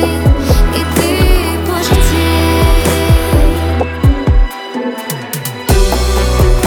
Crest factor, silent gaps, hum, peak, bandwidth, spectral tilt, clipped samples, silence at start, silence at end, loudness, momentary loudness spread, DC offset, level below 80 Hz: 10 dB; none; none; 0 dBFS; 19.5 kHz; -5.5 dB/octave; under 0.1%; 0 s; 0 s; -13 LUFS; 8 LU; under 0.1%; -14 dBFS